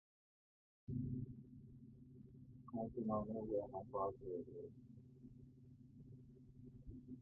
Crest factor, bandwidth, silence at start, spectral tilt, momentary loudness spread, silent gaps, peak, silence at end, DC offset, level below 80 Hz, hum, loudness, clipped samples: 20 dB; 1.8 kHz; 0.9 s; -12 dB/octave; 19 LU; none; -28 dBFS; 0 s; under 0.1%; -68 dBFS; none; -47 LUFS; under 0.1%